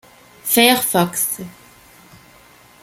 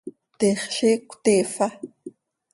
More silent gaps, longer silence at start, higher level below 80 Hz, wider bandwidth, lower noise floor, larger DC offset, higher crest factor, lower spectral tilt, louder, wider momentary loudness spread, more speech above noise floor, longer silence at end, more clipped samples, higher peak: neither; first, 0.45 s vs 0.05 s; first, -58 dBFS vs -68 dBFS; first, 16.5 kHz vs 11.5 kHz; first, -48 dBFS vs -44 dBFS; neither; about the same, 20 dB vs 18 dB; second, -2.5 dB/octave vs -4 dB/octave; first, -16 LUFS vs -22 LUFS; second, 16 LU vs 19 LU; first, 31 dB vs 23 dB; first, 1.3 s vs 0.45 s; neither; first, 0 dBFS vs -6 dBFS